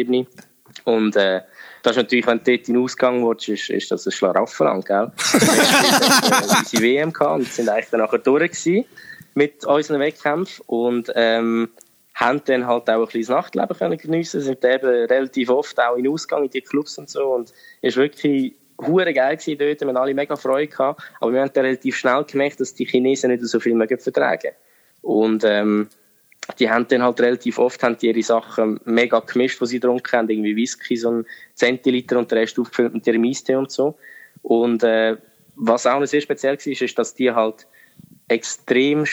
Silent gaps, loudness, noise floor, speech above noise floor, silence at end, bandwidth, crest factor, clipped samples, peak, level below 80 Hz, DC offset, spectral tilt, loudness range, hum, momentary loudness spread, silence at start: none; -19 LUFS; -48 dBFS; 29 dB; 0 s; over 20 kHz; 18 dB; under 0.1%; -2 dBFS; -68 dBFS; under 0.1%; -4 dB/octave; 5 LU; none; 7 LU; 0 s